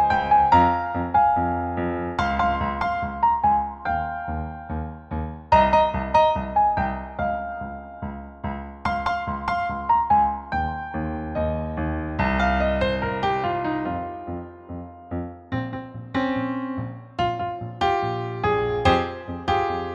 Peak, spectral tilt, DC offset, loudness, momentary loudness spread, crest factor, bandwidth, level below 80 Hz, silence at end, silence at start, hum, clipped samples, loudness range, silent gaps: -4 dBFS; -7 dB/octave; under 0.1%; -23 LUFS; 14 LU; 20 dB; 8.4 kHz; -38 dBFS; 0 s; 0 s; none; under 0.1%; 6 LU; none